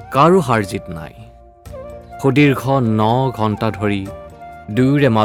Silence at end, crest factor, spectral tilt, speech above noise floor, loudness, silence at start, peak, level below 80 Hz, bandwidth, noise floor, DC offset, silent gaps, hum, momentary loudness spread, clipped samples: 0 s; 16 dB; -7 dB/octave; 22 dB; -16 LUFS; 0 s; 0 dBFS; -44 dBFS; 16.5 kHz; -37 dBFS; under 0.1%; none; none; 22 LU; under 0.1%